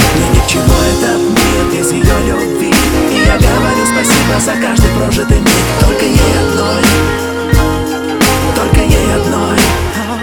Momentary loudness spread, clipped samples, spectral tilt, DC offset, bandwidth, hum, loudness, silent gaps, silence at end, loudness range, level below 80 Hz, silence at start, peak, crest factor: 4 LU; under 0.1%; -4.5 dB/octave; 0.4%; 20 kHz; none; -10 LUFS; none; 0 s; 1 LU; -18 dBFS; 0 s; 0 dBFS; 10 dB